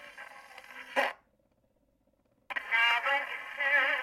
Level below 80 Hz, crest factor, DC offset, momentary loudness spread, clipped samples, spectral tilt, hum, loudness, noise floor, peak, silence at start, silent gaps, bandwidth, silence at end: -78 dBFS; 18 dB; under 0.1%; 22 LU; under 0.1%; 0 dB/octave; none; -29 LUFS; -72 dBFS; -14 dBFS; 0 s; none; 16.5 kHz; 0 s